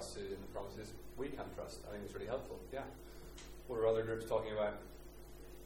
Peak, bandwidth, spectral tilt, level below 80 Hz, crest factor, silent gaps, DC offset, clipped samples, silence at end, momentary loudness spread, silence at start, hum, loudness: -22 dBFS; 17 kHz; -5.5 dB/octave; -56 dBFS; 20 dB; none; under 0.1%; under 0.1%; 0 s; 18 LU; 0 s; none; -42 LUFS